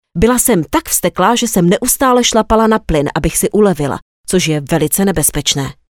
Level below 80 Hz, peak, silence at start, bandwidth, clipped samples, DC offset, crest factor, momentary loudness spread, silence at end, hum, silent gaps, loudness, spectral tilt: -30 dBFS; 0 dBFS; 0.15 s; 19.5 kHz; under 0.1%; under 0.1%; 14 dB; 5 LU; 0.25 s; none; 4.02-4.24 s; -13 LUFS; -4 dB/octave